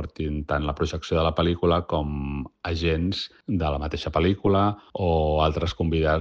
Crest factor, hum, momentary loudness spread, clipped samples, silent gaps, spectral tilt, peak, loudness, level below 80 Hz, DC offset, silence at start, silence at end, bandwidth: 16 dB; none; 8 LU; under 0.1%; none; -7 dB/octave; -8 dBFS; -25 LUFS; -34 dBFS; under 0.1%; 0 s; 0 s; 7.4 kHz